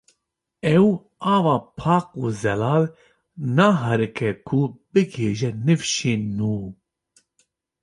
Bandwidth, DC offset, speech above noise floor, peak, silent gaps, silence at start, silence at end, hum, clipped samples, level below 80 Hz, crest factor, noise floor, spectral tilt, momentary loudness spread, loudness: 11.5 kHz; under 0.1%; 57 dB; -4 dBFS; none; 0.65 s; 1.1 s; none; under 0.1%; -54 dBFS; 18 dB; -77 dBFS; -6 dB/octave; 9 LU; -22 LUFS